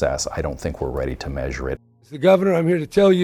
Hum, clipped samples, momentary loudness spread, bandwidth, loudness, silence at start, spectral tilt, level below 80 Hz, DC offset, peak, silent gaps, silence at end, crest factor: none; under 0.1%; 12 LU; 14.5 kHz; -21 LUFS; 0 s; -6 dB/octave; -36 dBFS; under 0.1%; -4 dBFS; none; 0 s; 16 dB